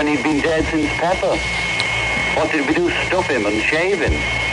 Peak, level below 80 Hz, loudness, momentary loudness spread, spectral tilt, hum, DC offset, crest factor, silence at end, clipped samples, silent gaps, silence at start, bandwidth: -2 dBFS; -34 dBFS; -17 LUFS; 2 LU; -4.5 dB/octave; none; under 0.1%; 16 dB; 0 s; under 0.1%; none; 0 s; 11.5 kHz